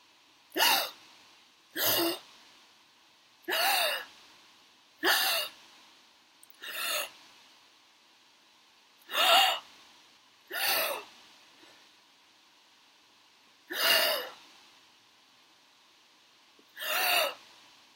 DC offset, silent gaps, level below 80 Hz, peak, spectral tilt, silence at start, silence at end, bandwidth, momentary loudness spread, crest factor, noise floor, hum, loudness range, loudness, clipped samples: under 0.1%; none; -88 dBFS; -10 dBFS; 0.5 dB/octave; 0.55 s; 0.6 s; 16 kHz; 17 LU; 24 dB; -62 dBFS; none; 7 LU; -28 LUFS; under 0.1%